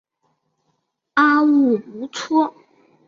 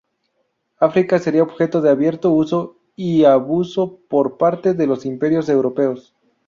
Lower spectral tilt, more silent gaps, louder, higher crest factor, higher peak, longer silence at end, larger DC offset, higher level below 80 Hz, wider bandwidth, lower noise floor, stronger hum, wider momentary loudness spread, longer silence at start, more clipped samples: second, -4.5 dB/octave vs -8 dB/octave; neither; about the same, -18 LUFS vs -17 LUFS; about the same, 16 dB vs 16 dB; about the same, -4 dBFS vs -2 dBFS; first, 0.6 s vs 0.45 s; neither; second, -70 dBFS vs -60 dBFS; about the same, 7.6 kHz vs 7.4 kHz; about the same, -71 dBFS vs -69 dBFS; neither; first, 12 LU vs 7 LU; first, 1.15 s vs 0.8 s; neither